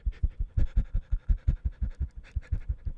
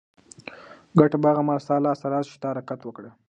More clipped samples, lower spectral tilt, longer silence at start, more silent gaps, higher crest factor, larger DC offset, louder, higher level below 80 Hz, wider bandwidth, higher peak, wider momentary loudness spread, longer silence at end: neither; about the same, -9 dB/octave vs -8.5 dB/octave; second, 0.05 s vs 0.5 s; neither; second, 16 dB vs 22 dB; neither; second, -34 LUFS vs -23 LUFS; first, -30 dBFS vs -66 dBFS; second, 3.8 kHz vs 9.2 kHz; second, -12 dBFS vs -2 dBFS; second, 6 LU vs 22 LU; second, 0 s vs 0.2 s